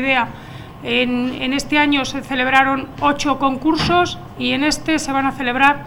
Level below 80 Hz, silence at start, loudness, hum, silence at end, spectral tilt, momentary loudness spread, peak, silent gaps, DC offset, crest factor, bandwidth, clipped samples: -40 dBFS; 0 s; -17 LUFS; none; 0 s; -4 dB/octave; 7 LU; 0 dBFS; none; under 0.1%; 18 dB; 18 kHz; under 0.1%